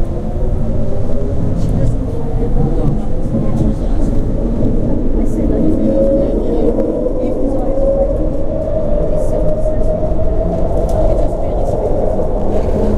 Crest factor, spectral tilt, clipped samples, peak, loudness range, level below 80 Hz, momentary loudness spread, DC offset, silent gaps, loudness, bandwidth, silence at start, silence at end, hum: 12 dB; -9.5 dB/octave; under 0.1%; 0 dBFS; 2 LU; -16 dBFS; 5 LU; under 0.1%; none; -17 LUFS; 3.9 kHz; 0 s; 0 s; none